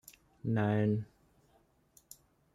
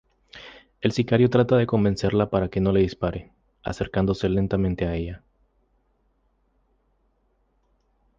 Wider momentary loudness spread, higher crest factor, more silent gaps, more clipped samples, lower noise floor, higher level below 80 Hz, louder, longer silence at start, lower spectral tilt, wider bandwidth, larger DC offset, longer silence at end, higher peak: first, 26 LU vs 17 LU; about the same, 18 dB vs 20 dB; neither; neither; about the same, -70 dBFS vs -67 dBFS; second, -68 dBFS vs -42 dBFS; second, -33 LUFS vs -23 LUFS; about the same, 0.45 s vs 0.35 s; about the same, -8 dB/octave vs -7.5 dB/octave; first, 14 kHz vs 7.6 kHz; neither; second, 1.5 s vs 3 s; second, -18 dBFS vs -6 dBFS